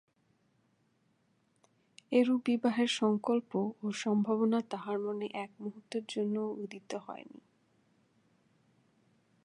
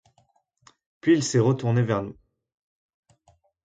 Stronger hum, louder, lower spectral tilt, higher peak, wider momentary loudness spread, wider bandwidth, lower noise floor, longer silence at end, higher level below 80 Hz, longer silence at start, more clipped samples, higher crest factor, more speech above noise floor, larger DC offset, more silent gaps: neither; second, -33 LUFS vs -23 LUFS; about the same, -5.5 dB/octave vs -6 dB/octave; second, -16 dBFS vs -10 dBFS; first, 13 LU vs 8 LU; first, 11 kHz vs 9.4 kHz; first, -74 dBFS vs -66 dBFS; first, 2.15 s vs 1.55 s; second, -88 dBFS vs -62 dBFS; first, 2.1 s vs 1.05 s; neither; about the same, 20 dB vs 18 dB; about the same, 41 dB vs 44 dB; neither; neither